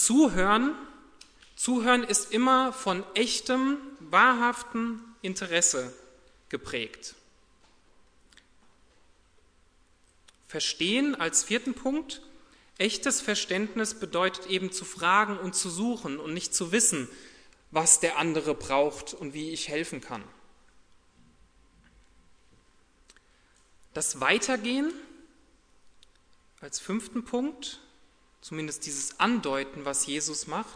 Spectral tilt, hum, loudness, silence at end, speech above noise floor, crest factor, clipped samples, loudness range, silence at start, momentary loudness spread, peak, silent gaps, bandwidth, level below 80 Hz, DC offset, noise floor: -2 dB/octave; none; -27 LUFS; 0 s; 35 dB; 24 dB; under 0.1%; 13 LU; 0 s; 16 LU; -6 dBFS; none; 11 kHz; -58 dBFS; under 0.1%; -62 dBFS